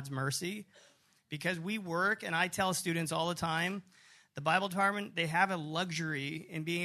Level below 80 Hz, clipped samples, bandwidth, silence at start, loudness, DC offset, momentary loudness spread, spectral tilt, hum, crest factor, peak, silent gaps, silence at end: -72 dBFS; under 0.1%; 13.5 kHz; 0 s; -33 LUFS; under 0.1%; 9 LU; -4 dB/octave; none; 22 dB; -12 dBFS; none; 0 s